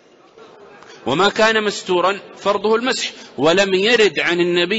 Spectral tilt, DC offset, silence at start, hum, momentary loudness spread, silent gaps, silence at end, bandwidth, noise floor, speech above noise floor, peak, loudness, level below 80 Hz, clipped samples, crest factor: -3.5 dB/octave; under 0.1%; 0.4 s; none; 8 LU; none; 0 s; 8 kHz; -45 dBFS; 29 dB; -4 dBFS; -16 LUFS; -56 dBFS; under 0.1%; 14 dB